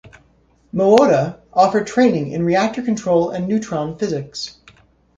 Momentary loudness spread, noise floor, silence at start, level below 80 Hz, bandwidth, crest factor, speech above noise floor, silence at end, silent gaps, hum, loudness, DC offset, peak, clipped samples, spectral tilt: 12 LU; -56 dBFS; 0.05 s; -54 dBFS; 7.8 kHz; 18 dB; 39 dB; 0.65 s; none; none; -17 LUFS; under 0.1%; 0 dBFS; under 0.1%; -6 dB/octave